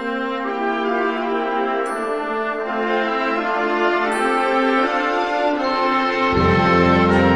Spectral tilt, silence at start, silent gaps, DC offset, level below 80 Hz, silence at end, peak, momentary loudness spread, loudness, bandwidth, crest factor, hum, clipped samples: -6.5 dB/octave; 0 s; none; 0.3%; -44 dBFS; 0 s; -4 dBFS; 8 LU; -19 LUFS; 11 kHz; 16 dB; none; under 0.1%